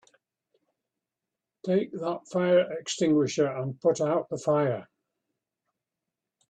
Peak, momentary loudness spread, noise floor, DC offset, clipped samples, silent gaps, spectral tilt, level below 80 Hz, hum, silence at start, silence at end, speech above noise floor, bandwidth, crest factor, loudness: -12 dBFS; 8 LU; -88 dBFS; under 0.1%; under 0.1%; none; -5.5 dB/octave; -72 dBFS; none; 1.65 s; 1.65 s; 62 dB; 9.4 kHz; 16 dB; -27 LUFS